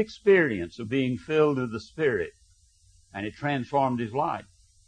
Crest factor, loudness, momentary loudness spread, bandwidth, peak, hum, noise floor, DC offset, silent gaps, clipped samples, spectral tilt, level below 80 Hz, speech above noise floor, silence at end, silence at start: 18 dB; -27 LUFS; 15 LU; 9.6 kHz; -10 dBFS; none; -60 dBFS; under 0.1%; none; under 0.1%; -7 dB/octave; -60 dBFS; 34 dB; 0.45 s; 0 s